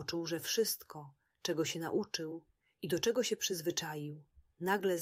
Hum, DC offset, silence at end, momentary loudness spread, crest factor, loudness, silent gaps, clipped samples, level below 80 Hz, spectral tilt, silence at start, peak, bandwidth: none; under 0.1%; 0 s; 14 LU; 18 dB; -36 LUFS; none; under 0.1%; -74 dBFS; -3.5 dB/octave; 0 s; -18 dBFS; 16 kHz